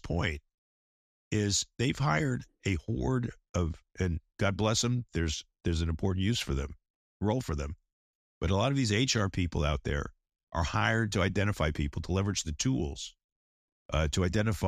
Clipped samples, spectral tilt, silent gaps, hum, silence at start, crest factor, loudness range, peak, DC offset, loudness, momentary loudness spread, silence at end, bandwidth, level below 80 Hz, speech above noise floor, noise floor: under 0.1%; -5 dB/octave; 0.54-1.31 s, 3.49-3.54 s, 6.90-7.20 s, 7.93-8.41 s, 10.43-10.47 s, 13.24-13.89 s; none; 0.05 s; 20 dB; 2 LU; -10 dBFS; under 0.1%; -31 LUFS; 8 LU; 0 s; 14.5 kHz; -42 dBFS; over 60 dB; under -90 dBFS